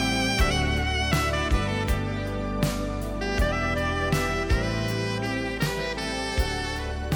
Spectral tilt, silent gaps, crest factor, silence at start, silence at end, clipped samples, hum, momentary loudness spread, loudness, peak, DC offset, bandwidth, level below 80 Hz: -5 dB/octave; none; 16 dB; 0 s; 0 s; under 0.1%; none; 6 LU; -26 LUFS; -10 dBFS; under 0.1%; 18 kHz; -32 dBFS